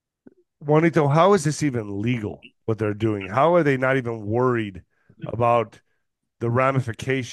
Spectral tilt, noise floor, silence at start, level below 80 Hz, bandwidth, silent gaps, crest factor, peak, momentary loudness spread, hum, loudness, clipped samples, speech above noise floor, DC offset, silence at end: -6.5 dB/octave; -76 dBFS; 0.6 s; -58 dBFS; 12.5 kHz; none; 18 dB; -4 dBFS; 15 LU; none; -21 LUFS; under 0.1%; 55 dB; under 0.1%; 0 s